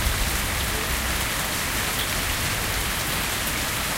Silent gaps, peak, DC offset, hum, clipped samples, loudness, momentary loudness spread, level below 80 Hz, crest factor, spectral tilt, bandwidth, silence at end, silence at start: none; -10 dBFS; under 0.1%; none; under 0.1%; -24 LUFS; 1 LU; -32 dBFS; 16 dB; -2 dB/octave; 17 kHz; 0 s; 0 s